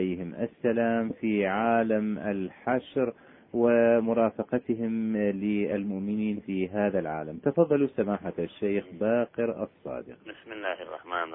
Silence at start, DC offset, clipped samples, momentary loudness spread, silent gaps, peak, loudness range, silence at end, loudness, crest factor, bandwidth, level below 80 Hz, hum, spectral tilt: 0 s; under 0.1%; under 0.1%; 11 LU; none; -8 dBFS; 3 LU; 0 s; -28 LUFS; 18 dB; 3.8 kHz; -66 dBFS; none; -11 dB/octave